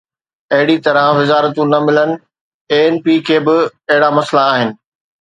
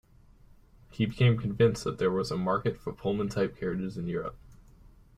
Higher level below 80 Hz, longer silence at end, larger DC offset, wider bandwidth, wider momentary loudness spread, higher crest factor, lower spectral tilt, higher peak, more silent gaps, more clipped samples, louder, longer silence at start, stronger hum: second, -64 dBFS vs -54 dBFS; about the same, 0.45 s vs 0.55 s; neither; second, 9.4 kHz vs 14 kHz; second, 5 LU vs 9 LU; about the same, 14 dB vs 18 dB; about the same, -6 dB/octave vs -7 dB/octave; first, 0 dBFS vs -12 dBFS; first, 2.41-2.65 s vs none; neither; first, -13 LUFS vs -29 LUFS; second, 0.5 s vs 0.9 s; neither